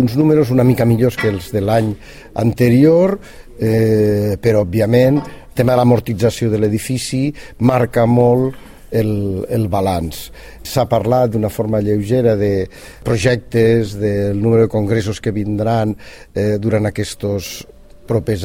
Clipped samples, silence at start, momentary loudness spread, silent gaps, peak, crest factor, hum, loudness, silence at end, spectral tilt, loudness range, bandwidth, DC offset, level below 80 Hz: under 0.1%; 0 s; 10 LU; none; 0 dBFS; 14 dB; none; -16 LUFS; 0 s; -7 dB/octave; 4 LU; 16.5 kHz; under 0.1%; -40 dBFS